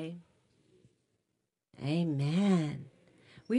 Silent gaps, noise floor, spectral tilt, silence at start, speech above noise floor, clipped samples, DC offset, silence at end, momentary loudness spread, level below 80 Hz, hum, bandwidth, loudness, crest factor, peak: none; -84 dBFS; -7.5 dB/octave; 0 s; 53 dB; under 0.1%; under 0.1%; 0 s; 17 LU; -76 dBFS; none; 10.5 kHz; -32 LUFS; 16 dB; -18 dBFS